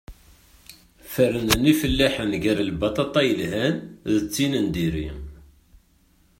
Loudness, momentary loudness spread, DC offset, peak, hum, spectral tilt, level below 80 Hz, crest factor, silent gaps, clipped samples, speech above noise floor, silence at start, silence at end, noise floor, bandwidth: -22 LUFS; 11 LU; under 0.1%; -2 dBFS; none; -5 dB/octave; -40 dBFS; 22 dB; none; under 0.1%; 38 dB; 0.1 s; 1.05 s; -60 dBFS; 16.5 kHz